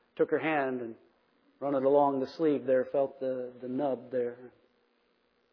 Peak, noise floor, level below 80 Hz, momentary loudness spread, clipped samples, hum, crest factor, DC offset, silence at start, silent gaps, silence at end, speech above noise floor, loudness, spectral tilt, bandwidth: -12 dBFS; -72 dBFS; -82 dBFS; 12 LU; under 0.1%; none; 18 dB; under 0.1%; 0.15 s; none; 1.05 s; 42 dB; -30 LUFS; -5 dB/octave; 5.4 kHz